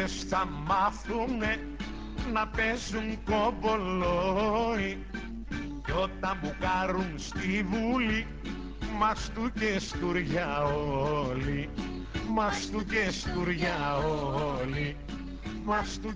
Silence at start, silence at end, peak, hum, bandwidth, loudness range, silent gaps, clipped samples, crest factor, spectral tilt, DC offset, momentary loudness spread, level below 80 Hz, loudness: 0 s; 0 s; -14 dBFS; none; 8 kHz; 1 LU; none; under 0.1%; 16 dB; -5.5 dB/octave; under 0.1%; 10 LU; -42 dBFS; -31 LUFS